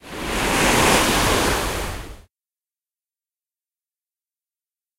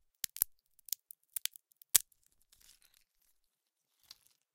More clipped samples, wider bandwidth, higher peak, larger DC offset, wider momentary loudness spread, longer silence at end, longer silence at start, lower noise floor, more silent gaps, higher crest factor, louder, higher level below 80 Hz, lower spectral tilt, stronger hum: neither; about the same, 16 kHz vs 17 kHz; about the same, -2 dBFS vs -2 dBFS; neither; about the same, 13 LU vs 13 LU; first, 2.75 s vs 2.55 s; second, 0.05 s vs 0.4 s; first, under -90 dBFS vs -84 dBFS; neither; second, 20 dB vs 40 dB; first, -18 LUFS vs -35 LUFS; first, -34 dBFS vs -72 dBFS; first, -3 dB/octave vs 2.5 dB/octave; neither